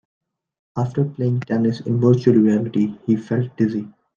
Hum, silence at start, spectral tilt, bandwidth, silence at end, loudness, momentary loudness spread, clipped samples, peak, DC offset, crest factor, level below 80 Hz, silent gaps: none; 0.75 s; -9.5 dB/octave; 7.2 kHz; 0.25 s; -20 LUFS; 9 LU; under 0.1%; -2 dBFS; under 0.1%; 18 dB; -62 dBFS; none